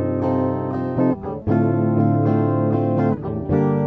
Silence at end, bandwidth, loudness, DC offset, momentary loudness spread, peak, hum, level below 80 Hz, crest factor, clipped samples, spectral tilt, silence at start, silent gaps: 0 s; 4.4 kHz; -20 LUFS; under 0.1%; 5 LU; -6 dBFS; none; -46 dBFS; 14 dB; under 0.1%; -12 dB/octave; 0 s; none